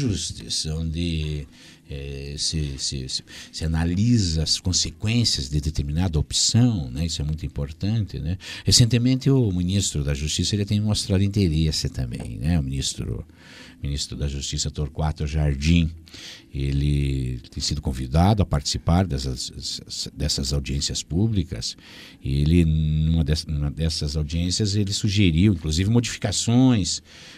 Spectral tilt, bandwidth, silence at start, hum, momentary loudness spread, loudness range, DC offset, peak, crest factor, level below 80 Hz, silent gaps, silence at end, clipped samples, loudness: -5 dB/octave; 15 kHz; 0 s; none; 11 LU; 5 LU; under 0.1%; -2 dBFS; 20 dB; -32 dBFS; none; 0 s; under 0.1%; -23 LUFS